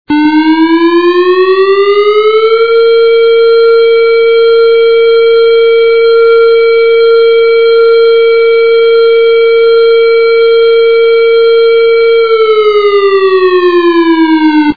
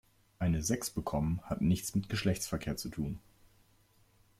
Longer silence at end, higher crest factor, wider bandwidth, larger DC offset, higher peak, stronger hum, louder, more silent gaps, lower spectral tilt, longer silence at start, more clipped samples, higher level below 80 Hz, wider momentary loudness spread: second, 0.05 s vs 1.2 s; second, 6 dB vs 18 dB; second, 4.9 kHz vs 16 kHz; first, 2% vs under 0.1%; first, 0 dBFS vs -18 dBFS; neither; first, -6 LUFS vs -34 LUFS; neither; about the same, -6 dB/octave vs -5.5 dB/octave; second, 0.1 s vs 0.4 s; first, 0.3% vs under 0.1%; about the same, -48 dBFS vs -52 dBFS; second, 2 LU vs 7 LU